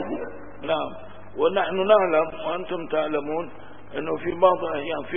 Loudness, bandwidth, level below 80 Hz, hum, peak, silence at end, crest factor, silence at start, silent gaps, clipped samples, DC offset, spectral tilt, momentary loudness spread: -24 LUFS; 3.7 kHz; -56 dBFS; none; -4 dBFS; 0 s; 20 dB; 0 s; none; under 0.1%; 1%; -9.5 dB/octave; 17 LU